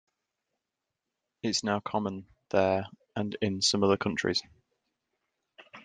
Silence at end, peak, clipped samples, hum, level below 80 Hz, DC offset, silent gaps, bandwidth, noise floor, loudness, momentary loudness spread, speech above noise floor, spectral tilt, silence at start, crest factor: 0.05 s; -10 dBFS; under 0.1%; none; -70 dBFS; under 0.1%; none; 9.8 kHz; -87 dBFS; -29 LUFS; 11 LU; 58 dB; -4 dB/octave; 1.45 s; 22 dB